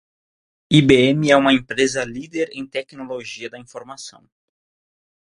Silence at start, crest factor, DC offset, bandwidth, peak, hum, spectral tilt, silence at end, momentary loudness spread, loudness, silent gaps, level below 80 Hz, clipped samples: 0.7 s; 20 dB; under 0.1%; 11.5 kHz; 0 dBFS; none; -5 dB/octave; 1.2 s; 22 LU; -17 LUFS; none; -50 dBFS; under 0.1%